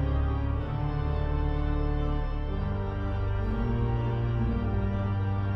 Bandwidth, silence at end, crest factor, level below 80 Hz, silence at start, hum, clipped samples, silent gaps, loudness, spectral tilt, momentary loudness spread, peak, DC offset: 5.8 kHz; 0 s; 12 dB; -32 dBFS; 0 s; none; under 0.1%; none; -30 LUFS; -10 dB/octave; 3 LU; -16 dBFS; under 0.1%